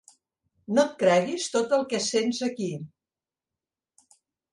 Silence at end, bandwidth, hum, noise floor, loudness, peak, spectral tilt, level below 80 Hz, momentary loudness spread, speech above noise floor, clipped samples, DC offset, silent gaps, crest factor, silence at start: 1.65 s; 11.5 kHz; none; under -90 dBFS; -25 LUFS; -8 dBFS; -4 dB/octave; -74 dBFS; 11 LU; over 65 dB; under 0.1%; under 0.1%; none; 20 dB; 0.7 s